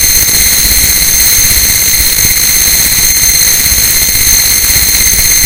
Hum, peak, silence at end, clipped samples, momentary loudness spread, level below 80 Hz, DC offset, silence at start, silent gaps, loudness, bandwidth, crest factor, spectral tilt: none; 0 dBFS; 0 s; 4%; 1 LU; -22 dBFS; under 0.1%; 0 s; none; -4 LUFS; over 20 kHz; 8 dB; 0 dB/octave